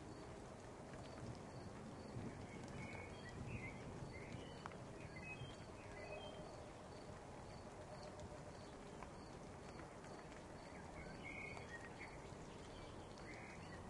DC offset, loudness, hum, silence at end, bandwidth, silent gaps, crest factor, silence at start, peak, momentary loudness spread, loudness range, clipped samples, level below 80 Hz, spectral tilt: under 0.1%; -54 LUFS; none; 0 s; 11.5 kHz; none; 22 dB; 0 s; -32 dBFS; 4 LU; 3 LU; under 0.1%; -66 dBFS; -5.5 dB/octave